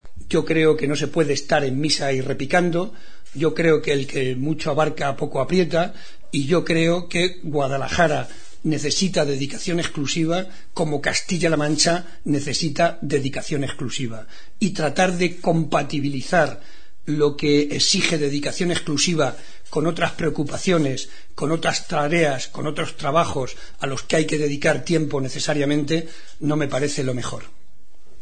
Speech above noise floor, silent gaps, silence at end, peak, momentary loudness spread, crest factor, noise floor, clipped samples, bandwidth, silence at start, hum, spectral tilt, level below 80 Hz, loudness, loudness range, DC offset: 32 dB; none; 0.75 s; -2 dBFS; 9 LU; 20 dB; -54 dBFS; under 0.1%; 9.4 kHz; 0 s; none; -4.5 dB/octave; -48 dBFS; -22 LUFS; 2 LU; 4%